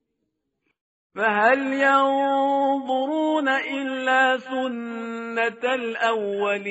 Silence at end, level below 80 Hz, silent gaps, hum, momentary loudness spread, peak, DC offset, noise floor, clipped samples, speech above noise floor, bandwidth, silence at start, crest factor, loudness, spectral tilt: 0 s; -74 dBFS; none; none; 9 LU; -6 dBFS; under 0.1%; -77 dBFS; under 0.1%; 55 dB; 8 kHz; 1.15 s; 18 dB; -22 LUFS; -1 dB/octave